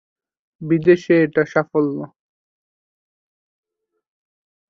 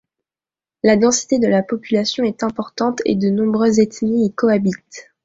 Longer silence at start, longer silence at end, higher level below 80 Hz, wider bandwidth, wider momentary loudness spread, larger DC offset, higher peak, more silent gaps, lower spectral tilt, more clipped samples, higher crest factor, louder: second, 0.6 s vs 0.85 s; first, 2.65 s vs 0.25 s; second, -64 dBFS vs -56 dBFS; second, 6.8 kHz vs 8 kHz; first, 17 LU vs 7 LU; neither; about the same, -2 dBFS vs -2 dBFS; neither; first, -8 dB/octave vs -5 dB/octave; neither; about the same, 20 dB vs 16 dB; about the same, -17 LUFS vs -17 LUFS